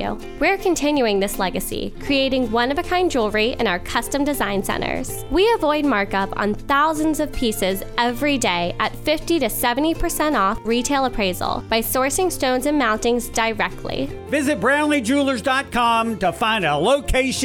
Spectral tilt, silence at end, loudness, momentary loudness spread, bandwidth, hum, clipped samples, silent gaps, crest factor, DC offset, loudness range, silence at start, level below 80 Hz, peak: -3.5 dB/octave; 0 s; -20 LUFS; 5 LU; 19 kHz; none; under 0.1%; none; 16 dB; under 0.1%; 1 LU; 0 s; -36 dBFS; -4 dBFS